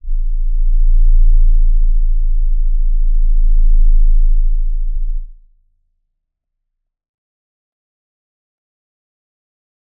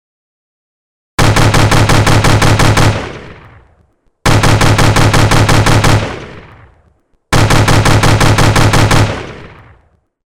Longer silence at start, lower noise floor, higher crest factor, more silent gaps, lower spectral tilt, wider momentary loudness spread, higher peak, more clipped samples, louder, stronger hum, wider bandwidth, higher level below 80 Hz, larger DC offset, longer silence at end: second, 0.05 s vs 1.2 s; first, -74 dBFS vs -53 dBFS; about the same, 10 dB vs 8 dB; neither; first, -15.5 dB/octave vs -5 dB/octave; second, 8 LU vs 13 LU; about the same, -2 dBFS vs -2 dBFS; neither; second, -19 LUFS vs -9 LUFS; neither; second, 0.1 kHz vs 16.5 kHz; first, -12 dBFS vs -18 dBFS; neither; first, 4.65 s vs 0.8 s